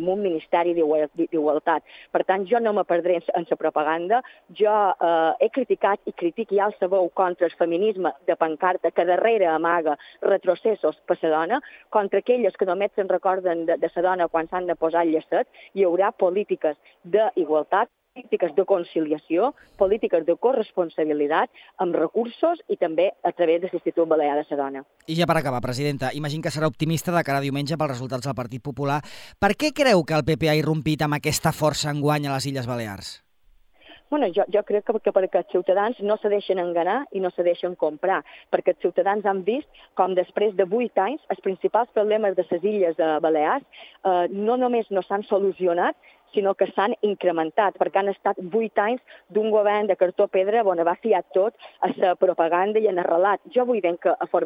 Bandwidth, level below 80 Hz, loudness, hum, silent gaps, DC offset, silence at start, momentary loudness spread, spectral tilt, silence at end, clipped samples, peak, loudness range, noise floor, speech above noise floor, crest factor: 16.5 kHz; -60 dBFS; -23 LUFS; none; none; under 0.1%; 0 s; 7 LU; -6 dB/octave; 0 s; under 0.1%; -4 dBFS; 2 LU; -59 dBFS; 37 dB; 18 dB